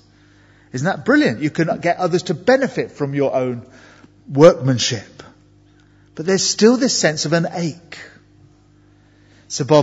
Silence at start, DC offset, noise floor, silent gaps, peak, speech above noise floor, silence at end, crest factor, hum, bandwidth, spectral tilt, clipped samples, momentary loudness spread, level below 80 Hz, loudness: 0.75 s; under 0.1%; -51 dBFS; none; 0 dBFS; 35 dB; 0 s; 18 dB; 50 Hz at -50 dBFS; 8 kHz; -4.5 dB/octave; under 0.1%; 16 LU; -58 dBFS; -17 LUFS